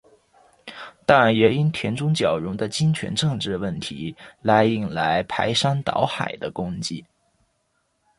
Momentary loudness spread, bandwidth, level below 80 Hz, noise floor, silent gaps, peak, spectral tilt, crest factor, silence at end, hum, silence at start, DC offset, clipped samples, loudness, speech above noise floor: 13 LU; 11.5 kHz; -54 dBFS; -70 dBFS; none; -2 dBFS; -5.5 dB/octave; 20 dB; 1.15 s; none; 0.65 s; under 0.1%; under 0.1%; -22 LUFS; 49 dB